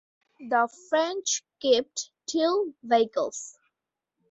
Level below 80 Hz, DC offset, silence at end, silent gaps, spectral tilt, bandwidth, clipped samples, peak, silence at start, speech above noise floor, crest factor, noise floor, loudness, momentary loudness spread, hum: -74 dBFS; under 0.1%; 0.8 s; none; -1.5 dB/octave; 8.2 kHz; under 0.1%; -8 dBFS; 0.4 s; 60 dB; 20 dB; -86 dBFS; -26 LUFS; 11 LU; none